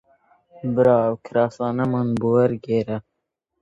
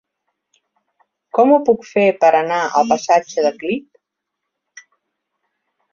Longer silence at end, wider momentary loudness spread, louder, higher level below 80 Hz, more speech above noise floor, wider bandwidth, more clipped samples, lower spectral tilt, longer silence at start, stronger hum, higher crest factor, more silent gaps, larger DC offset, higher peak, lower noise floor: second, 0.6 s vs 2.1 s; about the same, 10 LU vs 10 LU; second, -21 LUFS vs -16 LUFS; first, -56 dBFS vs -66 dBFS; second, 58 dB vs 64 dB; about the same, 7.8 kHz vs 7.4 kHz; neither; first, -9 dB/octave vs -4.5 dB/octave; second, 0.65 s vs 1.35 s; second, none vs 50 Hz at -50 dBFS; about the same, 18 dB vs 18 dB; neither; neither; about the same, -4 dBFS vs -2 dBFS; about the same, -78 dBFS vs -79 dBFS